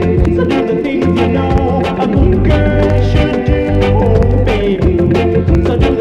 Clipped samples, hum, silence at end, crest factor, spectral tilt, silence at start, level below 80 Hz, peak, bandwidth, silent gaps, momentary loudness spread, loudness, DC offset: under 0.1%; none; 0 s; 10 dB; -8.5 dB/octave; 0 s; -18 dBFS; 0 dBFS; 8 kHz; none; 3 LU; -12 LUFS; under 0.1%